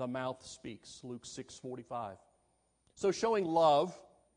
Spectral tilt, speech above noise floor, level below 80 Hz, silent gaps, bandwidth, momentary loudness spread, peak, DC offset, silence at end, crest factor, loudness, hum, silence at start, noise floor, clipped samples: -5 dB/octave; 41 dB; -74 dBFS; none; 10.5 kHz; 19 LU; -16 dBFS; under 0.1%; 0.35 s; 20 dB; -33 LUFS; none; 0 s; -75 dBFS; under 0.1%